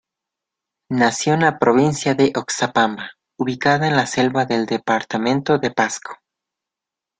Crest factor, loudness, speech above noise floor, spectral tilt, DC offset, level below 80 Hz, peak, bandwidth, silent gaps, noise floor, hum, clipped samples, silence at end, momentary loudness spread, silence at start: 18 dB; -18 LUFS; 68 dB; -4.5 dB/octave; under 0.1%; -58 dBFS; -2 dBFS; 9.6 kHz; none; -86 dBFS; none; under 0.1%; 1.05 s; 10 LU; 0.9 s